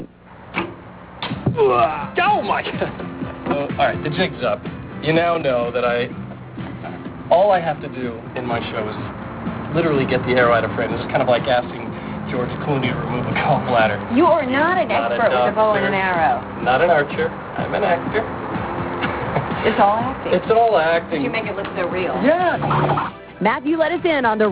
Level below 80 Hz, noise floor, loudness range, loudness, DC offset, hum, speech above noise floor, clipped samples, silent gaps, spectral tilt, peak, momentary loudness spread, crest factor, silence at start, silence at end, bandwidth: -44 dBFS; -40 dBFS; 4 LU; -19 LUFS; under 0.1%; none; 22 dB; under 0.1%; none; -10 dB/octave; -4 dBFS; 13 LU; 16 dB; 0 s; 0 s; 4 kHz